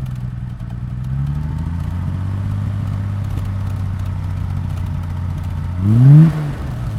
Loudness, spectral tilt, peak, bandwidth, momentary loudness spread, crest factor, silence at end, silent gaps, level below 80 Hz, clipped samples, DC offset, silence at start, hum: -18 LUFS; -9.5 dB/octave; 0 dBFS; 6.6 kHz; 15 LU; 16 dB; 0 s; none; -30 dBFS; under 0.1%; under 0.1%; 0 s; none